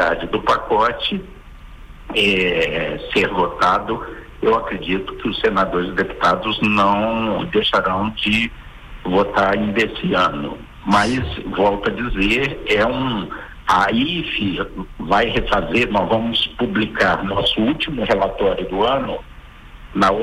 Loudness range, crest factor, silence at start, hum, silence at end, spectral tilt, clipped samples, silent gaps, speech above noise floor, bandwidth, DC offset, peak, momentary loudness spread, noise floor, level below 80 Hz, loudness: 1 LU; 14 dB; 0 s; none; 0 s; -5.5 dB/octave; under 0.1%; none; 21 dB; 15 kHz; under 0.1%; -4 dBFS; 8 LU; -39 dBFS; -36 dBFS; -18 LUFS